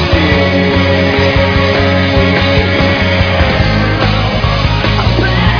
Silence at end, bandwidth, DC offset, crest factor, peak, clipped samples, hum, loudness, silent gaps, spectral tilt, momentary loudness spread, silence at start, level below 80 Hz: 0 s; 5.4 kHz; under 0.1%; 10 dB; 0 dBFS; 0.1%; none; -10 LUFS; none; -6.5 dB/octave; 2 LU; 0 s; -20 dBFS